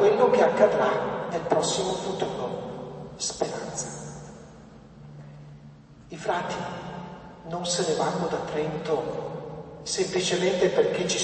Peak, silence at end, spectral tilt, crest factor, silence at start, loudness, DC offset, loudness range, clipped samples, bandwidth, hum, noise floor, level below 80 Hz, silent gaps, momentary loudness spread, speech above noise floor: -6 dBFS; 0 s; -4 dB/octave; 22 dB; 0 s; -26 LUFS; under 0.1%; 10 LU; under 0.1%; 8.8 kHz; none; -48 dBFS; -58 dBFS; none; 23 LU; 23 dB